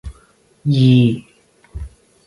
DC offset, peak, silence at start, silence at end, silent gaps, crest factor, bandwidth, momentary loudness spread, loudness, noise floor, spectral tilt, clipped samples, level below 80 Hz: under 0.1%; -2 dBFS; 0.05 s; 0.4 s; none; 16 dB; 11.5 kHz; 25 LU; -15 LUFS; -53 dBFS; -8.5 dB/octave; under 0.1%; -38 dBFS